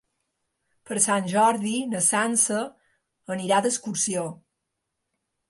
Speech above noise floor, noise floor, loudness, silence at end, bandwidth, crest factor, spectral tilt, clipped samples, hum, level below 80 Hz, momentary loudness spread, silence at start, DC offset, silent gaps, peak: 57 dB; -81 dBFS; -23 LUFS; 1.15 s; 12 kHz; 20 dB; -3 dB/octave; under 0.1%; none; -74 dBFS; 11 LU; 0.9 s; under 0.1%; none; -6 dBFS